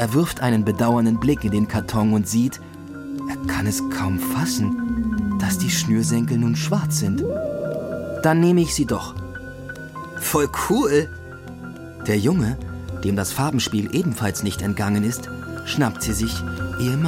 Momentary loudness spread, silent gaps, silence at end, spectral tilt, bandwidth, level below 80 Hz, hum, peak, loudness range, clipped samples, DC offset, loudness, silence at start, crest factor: 14 LU; none; 0 s; -5.5 dB/octave; 16.5 kHz; -40 dBFS; none; -4 dBFS; 3 LU; under 0.1%; under 0.1%; -22 LUFS; 0 s; 18 dB